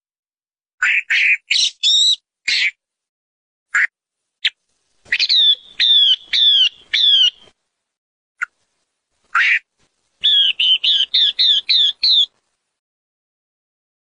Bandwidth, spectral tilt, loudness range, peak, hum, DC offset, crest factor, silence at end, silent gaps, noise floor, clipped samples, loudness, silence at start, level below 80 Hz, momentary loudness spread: 10.5 kHz; 5 dB/octave; 6 LU; -4 dBFS; none; under 0.1%; 14 dB; 1.95 s; 3.09-3.66 s, 7.98-8.35 s; under -90 dBFS; under 0.1%; -13 LUFS; 0.8 s; -70 dBFS; 11 LU